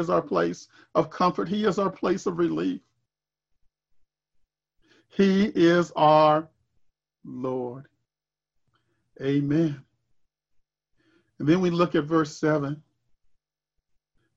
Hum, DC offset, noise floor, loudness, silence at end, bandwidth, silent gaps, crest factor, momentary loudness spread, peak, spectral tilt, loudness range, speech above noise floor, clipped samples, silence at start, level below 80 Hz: none; under 0.1%; under -90 dBFS; -24 LUFS; 1.55 s; 7.8 kHz; none; 20 dB; 15 LU; -6 dBFS; -7 dB/octave; 8 LU; over 67 dB; under 0.1%; 0 s; -64 dBFS